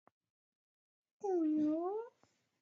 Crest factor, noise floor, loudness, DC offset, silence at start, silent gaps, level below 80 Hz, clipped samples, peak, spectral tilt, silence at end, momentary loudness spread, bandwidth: 12 dB; -76 dBFS; -37 LUFS; under 0.1%; 1.25 s; none; under -90 dBFS; under 0.1%; -28 dBFS; -7.5 dB/octave; 0.5 s; 11 LU; 6.8 kHz